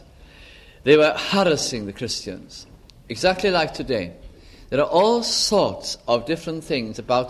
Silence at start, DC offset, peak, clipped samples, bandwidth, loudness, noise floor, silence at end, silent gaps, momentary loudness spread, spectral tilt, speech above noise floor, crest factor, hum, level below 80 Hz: 0.2 s; under 0.1%; -4 dBFS; under 0.1%; 14 kHz; -21 LUFS; -46 dBFS; 0 s; none; 13 LU; -3.5 dB/octave; 25 dB; 18 dB; none; -48 dBFS